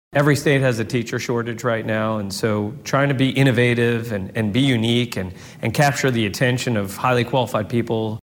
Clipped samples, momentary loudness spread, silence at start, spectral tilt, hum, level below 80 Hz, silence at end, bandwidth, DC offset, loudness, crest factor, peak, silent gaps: under 0.1%; 7 LU; 0.1 s; -5.5 dB/octave; none; -54 dBFS; 0.1 s; 17 kHz; under 0.1%; -20 LUFS; 16 dB; -4 dBFS; none